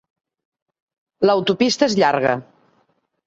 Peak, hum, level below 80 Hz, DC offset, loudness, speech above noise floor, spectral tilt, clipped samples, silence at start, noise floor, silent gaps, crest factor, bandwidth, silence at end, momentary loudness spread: -2 dBFS; none; -62 dBFS; under 0.1%; -18 LUFS; 48 dB; -4.5 dB/octave; under 0.1%; 1.2 s; -65 dBFS; none; 18 dB; 8 kHz; 0.85 s; 5 LU